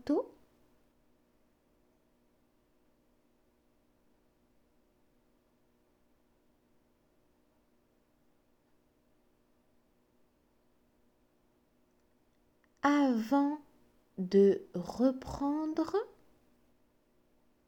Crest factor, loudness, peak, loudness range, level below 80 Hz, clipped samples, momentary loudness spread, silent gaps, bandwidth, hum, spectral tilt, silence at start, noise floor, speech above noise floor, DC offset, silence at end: 22 dB; -31 LUFS; -16 dBFS; 6 LU; -68 dBFS; under 0.1%; 16 LU; none; 18 kHz; none; -7 dB/octave; 0.05 s; -72 dBFS; 42 dB; under 0.1%; 1.6 s